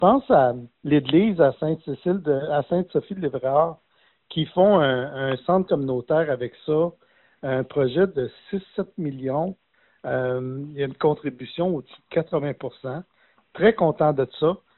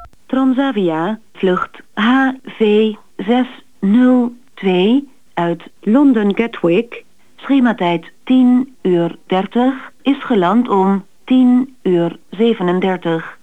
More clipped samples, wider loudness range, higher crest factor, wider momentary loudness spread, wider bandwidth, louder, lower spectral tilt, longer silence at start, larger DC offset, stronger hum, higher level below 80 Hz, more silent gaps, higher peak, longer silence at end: neither; first, 5 LU vs 1 LU; first, 20 dB vs 12 dB; first, 13 LU vs 10 LU; second, 4.2 kHz vs 8 kHz; second, -23 LUFS vs -15 LUFS; second, -5.5 dB/octave vs -8 dB/octave; about the same, 0 s vs 0 s; second, under 0.1% vs 0.7%; neither; about the same, -58 dBFS vs -56 dBFS; neither; about the same, -4 dBFS vs -2 dBFS; about the same, 0.2 s vs 0.1 s